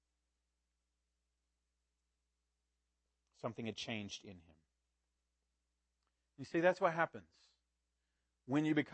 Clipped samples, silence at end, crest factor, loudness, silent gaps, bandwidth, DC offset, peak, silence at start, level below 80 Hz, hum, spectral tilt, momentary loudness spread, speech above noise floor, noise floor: under 0.1%; 0 s; 24 dB; -38 LUFS; none; 8.4 kHz; under 0.1%; -18 dBFS; 3.45 s; -82 dBFS; none; -5.5 dB/octave; 19 LU; 49 dB; -87 dBFS